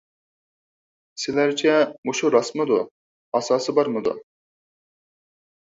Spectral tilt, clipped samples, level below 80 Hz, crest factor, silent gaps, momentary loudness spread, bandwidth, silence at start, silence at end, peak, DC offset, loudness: -4 dB/octave; under 0.1%; -70 dBFS; 20 dB; 1.98-2.03 s, 2.91-3.32 s; 11 LU; 7.8 kHz; 1.15 s; 1.45 s; -4 dBFS; under 0.1%; -22 LUFS